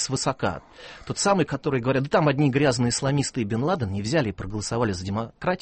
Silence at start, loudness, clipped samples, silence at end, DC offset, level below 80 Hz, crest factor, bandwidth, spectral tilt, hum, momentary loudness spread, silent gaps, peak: 0 s; -24 LUFS; under 0.1%; 0.05 s; under 0.1%; -50 dBFS; 16 dB; 8.8 kHz; -5 dB/octave; none; 9 LU; none; -8 dBFS